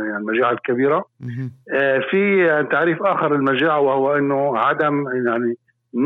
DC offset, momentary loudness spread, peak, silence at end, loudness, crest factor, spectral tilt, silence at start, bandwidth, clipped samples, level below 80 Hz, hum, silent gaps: under 0.1%; 10 LU; -8 dBFS; 0 s; -18 LUFS; 12 dB; -8.5 dB/octave; 0 s; 4.1 kHz; under 0.1%; -72 dBFS; none; none